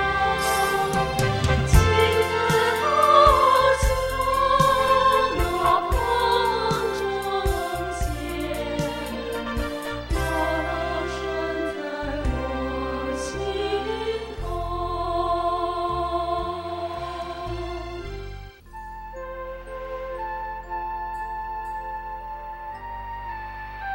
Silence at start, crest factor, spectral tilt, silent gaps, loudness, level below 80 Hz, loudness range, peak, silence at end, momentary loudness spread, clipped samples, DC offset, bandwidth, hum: 0 s; 20 dB; -5 dB/octave; none; -24 LUFS; -34 dBFS; 14 LU; -4 dBFS; 0 s; 16 LU; under 0.1%; under 0.1%; 16 kHz; none